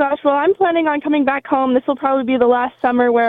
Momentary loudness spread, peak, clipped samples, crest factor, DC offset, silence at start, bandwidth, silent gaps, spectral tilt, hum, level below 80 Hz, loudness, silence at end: 3 LU; -2 dBFS; under 0.1%; 14 dB; under 0.1%; 0 s; 4.1 kHz; none; -7.5 dB/octave; none; -56 dBFS; -16 LUFS; 0 s